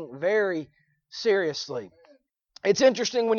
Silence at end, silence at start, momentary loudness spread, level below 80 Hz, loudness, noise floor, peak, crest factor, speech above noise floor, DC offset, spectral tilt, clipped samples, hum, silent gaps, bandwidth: 0 s; 0 s; 15 LU; -70 dBFS; -25 LUFS; -61 dBFS; -6 dBFS; 20 dB; 37 dB; under 0.1%; -3.5 dB/octave; under 0.1%; none; none; 7.2 kHz